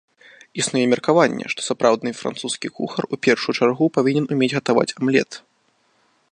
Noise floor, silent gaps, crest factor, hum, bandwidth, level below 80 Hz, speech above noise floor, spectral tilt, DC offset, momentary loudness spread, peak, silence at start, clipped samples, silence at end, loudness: -63 dBFS; none; 20 dB; none; 11 kHz; -68 dBFS; 44 dB; -4.5 dB/octave; under 0.1%; 9 LU; 0 dBFS; 0.55 s; under 0.1%; 0.95 s; -20 LUFS